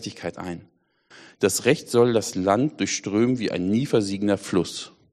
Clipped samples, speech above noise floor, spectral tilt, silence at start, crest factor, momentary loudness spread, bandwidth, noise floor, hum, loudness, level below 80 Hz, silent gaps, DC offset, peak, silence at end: under 0.1%; 29 dB; -5 dB/octave; 0 s; 20 dB; 13 LU; 13 kHz; -52 dBFS; none; -23 LUFS; -62 dBFS; none; under 0.1%; -4 dBFS; 0.25 s